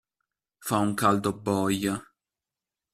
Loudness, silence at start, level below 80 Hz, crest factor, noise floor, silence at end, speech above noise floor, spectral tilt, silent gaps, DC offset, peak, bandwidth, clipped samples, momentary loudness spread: -27 LUFS; 0.6 s; -62 dBFS; 22 dB; -90 dBFS; 0.9 s; 64 dB; -5 dB/octave; none; under 0.1%; -6 dBFS; 15.5 kHz; under 0.1%; 9 LU